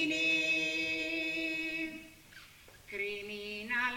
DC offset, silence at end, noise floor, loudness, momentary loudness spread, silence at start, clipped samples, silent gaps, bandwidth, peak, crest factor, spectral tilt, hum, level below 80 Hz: under 0.1%; 0 s; -56 dBFS; -33 LUFS; 23 LU; 0 s; under 0.1%; none; 18 kHz; -20 dBFS; 16 dB; -2.5 dB/octave; none; -66 dBFS